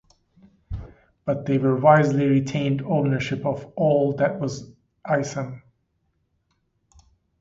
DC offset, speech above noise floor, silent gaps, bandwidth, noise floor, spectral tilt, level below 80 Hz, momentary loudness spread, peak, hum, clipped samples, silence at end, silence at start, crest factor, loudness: under 0.1%; 50 dB; none; 7.8 kHz; -71 dBFS; -7.5 dB/octave; -50 dBFS; 20 LU; -2 dBFS; none; under 0.1%; 1.85 s; 0.7 s; 22 dB; -22 LUFS